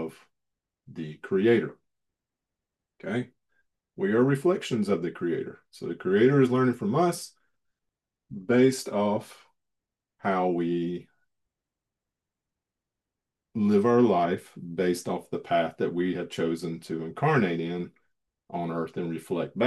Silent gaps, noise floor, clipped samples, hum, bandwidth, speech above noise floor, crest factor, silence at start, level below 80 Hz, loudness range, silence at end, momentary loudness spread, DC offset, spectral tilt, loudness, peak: none; -88 dBFS; under 0.1%; none; 12.5 kHz; 62 dB; 18 dB; 0 s; -72 dBFS; 7 LU; 0 s; 17 LU; under 0.1%; -6.5 dB/octave; -27 LUFS; -10 dBFS